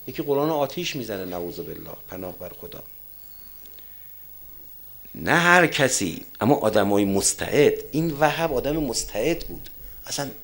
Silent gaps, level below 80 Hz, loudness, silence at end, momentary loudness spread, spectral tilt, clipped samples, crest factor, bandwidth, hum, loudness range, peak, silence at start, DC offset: none; -48 dBFS; -22 LUFS; 0 s; 19 LU; -4 dB/octave; under 0.1%; 24 dB; 16.5 kHz; none; 16 LU; 0 dBFS; 0 s; under 0.1%